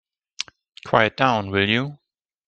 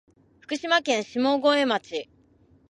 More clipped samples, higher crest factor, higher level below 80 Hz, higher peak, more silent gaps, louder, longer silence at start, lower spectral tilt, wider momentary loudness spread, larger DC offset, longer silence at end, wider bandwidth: neither; about the same, 22 dB vs 20 dB; first, -60 dBFS vs -70 dBFS; first, 0 dBFS vs -6 dBFS; neither; first, -20 LUFS vs -24 LUFS; about the same, 0.4 s vs 0.5 s; first, -5 dB/octave vs -3 dB/octave; about the same, 14 LU vs 13 LU; neither; about the same, 0.55 s vs 0.65 s; second, 9 kHz vs 11 kHz